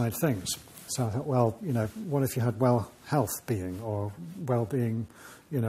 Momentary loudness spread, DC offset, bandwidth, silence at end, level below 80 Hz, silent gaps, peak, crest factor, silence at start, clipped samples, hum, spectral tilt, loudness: 9 LU; under 0.1%; 16 kHz; 0 s; -60 dBFS; none; -12 dBFS; 18 dB; 0 s; under 0.1%; none; -6 dB/octave; -30 LUFS